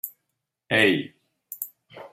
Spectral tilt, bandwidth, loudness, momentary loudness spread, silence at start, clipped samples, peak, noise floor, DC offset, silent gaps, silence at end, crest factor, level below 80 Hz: -4 dB/octave; 16 kHz; -23 LUFS; 21 LU; 0.05 s; under 0.1%; -6 dBFS; -80 dBFS; under 0.1%; none; 0.05 s; 22 dB; -72 dBFS